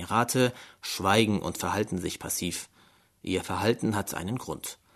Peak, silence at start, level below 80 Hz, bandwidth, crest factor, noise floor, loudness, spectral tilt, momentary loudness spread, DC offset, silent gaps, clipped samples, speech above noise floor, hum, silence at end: -8 dBFS; 0 s; -58 dBFS; 13.5 kHz; 22 dB; -61 dBFS; -29 LUFS; -4 dB/octave; 13 LU; under 0.1%; none; under 0.1%; 33 dB; none; 0.2 s